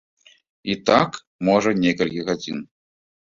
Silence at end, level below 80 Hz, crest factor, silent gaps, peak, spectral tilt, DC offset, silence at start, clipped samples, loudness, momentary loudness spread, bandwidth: 0.7 s; -56 dBFS; 20 dB; 1.27-1.39 s; -2 dBFS; -5.5 dB/octave; under 0.1%; 0.65 s; under 0.1%; -21 LUFS; 13 LU; 7.8 kHz